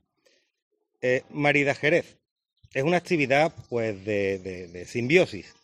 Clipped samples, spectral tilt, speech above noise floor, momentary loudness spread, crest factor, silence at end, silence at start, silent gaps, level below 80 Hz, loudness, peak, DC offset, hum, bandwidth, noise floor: under 0.1%; -5.5 dB/octave; 42 dB; 12 LU; 22 dB; 0.2 s; 1.05 s; 2.31-2.36 s; -64 dBFS; -25 LUFS; -4 dBFS; under 0.1%; none; 12 kHz; -67 dBFS